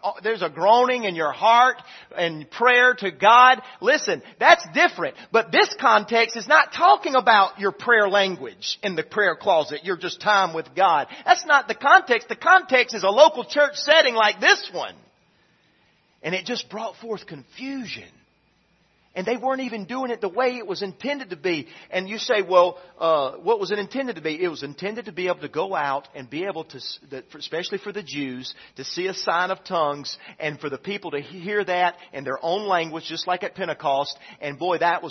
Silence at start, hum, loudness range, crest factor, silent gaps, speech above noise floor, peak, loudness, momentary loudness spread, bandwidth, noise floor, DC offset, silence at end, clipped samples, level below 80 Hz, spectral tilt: 0.05 s; none; 13 LU; 22 dB; none; 42 dB; 0 dBFS; -21 LUFS; 16 LU; 6.4 kHz; -64 dBFS; under 0.1%; 0 s; under 0.1%; -74 dBFS; -3 dB/octave